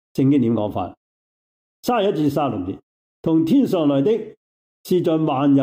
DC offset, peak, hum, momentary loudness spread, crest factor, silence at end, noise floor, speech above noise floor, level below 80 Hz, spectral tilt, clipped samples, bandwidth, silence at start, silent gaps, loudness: under 0.1%; -8 dBFS; none; 12 LU; 12 dB; 0 s; under -90 dBFS; over 72 dB; -60 dBFS; -8 dB/octave; under 0.1%; 16 kHz; 0.15 s; 0.97-1.83 s, 2.83-3.23 s, 4.37-4.84 s; -20 LUFS